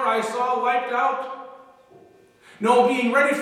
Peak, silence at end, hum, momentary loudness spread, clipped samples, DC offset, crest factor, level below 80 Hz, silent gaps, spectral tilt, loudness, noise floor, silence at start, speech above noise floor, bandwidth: -4 dBFS; 0 s; none; 16 LU; under 0.1%; under 0.1%; 18 dB; -80 dBFS; none; -4 dB/octave; -21 LUFS; -52 dBFS; 0 s; 32 dB; 14 kHz